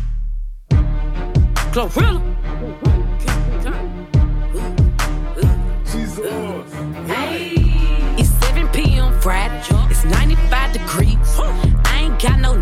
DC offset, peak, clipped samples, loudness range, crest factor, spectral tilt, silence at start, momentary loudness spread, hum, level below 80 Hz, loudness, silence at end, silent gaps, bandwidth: under 0.1%; -4 dBFS; under 0.1%; 3 LU; 12 dB; -5.5 dB/octave; 0 s; 9 LU; none; -16 dBFS; -18 LUFS; 0 s; none; 15 kHz